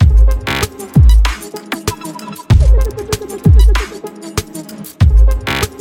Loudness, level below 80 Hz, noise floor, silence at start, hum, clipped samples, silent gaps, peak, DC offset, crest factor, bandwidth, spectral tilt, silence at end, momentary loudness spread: -14 LUFS; -12 dBFS; -29 dBFS; 0 s; none; under 0.1%; none; 0 dBFS; under 0.1%; 12 dB; 16 kHz; -5.5 dB/octave; 0.1 s; 16 LU